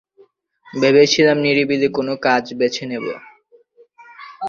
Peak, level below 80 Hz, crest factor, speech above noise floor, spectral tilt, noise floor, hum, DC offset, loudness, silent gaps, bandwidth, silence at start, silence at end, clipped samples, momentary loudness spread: 0 dBFS; -60 dBFS; 18 dB; 37 dB; -4.5 dB/octave; -53 dBFS; none; under 0.1%; -16 LUFS; none; 7.4 kHz; 0.75 s; 0 s; under 0.1%; 17 LU